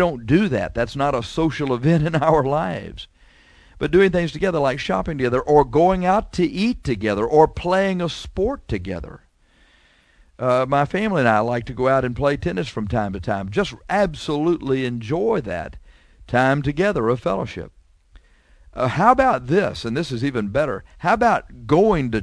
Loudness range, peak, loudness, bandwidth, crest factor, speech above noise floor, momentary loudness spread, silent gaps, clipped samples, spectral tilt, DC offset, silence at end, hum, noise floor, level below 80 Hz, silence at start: 4 LU; 0 dBFS; -20 LUFS; 11 kHz; 20 dB; 37 dB; 10 LU; none; under 0.1%; -7 dB/octave; under 0.1%; 0 s; none; -56 dBFS; -40 dBFS; 0 s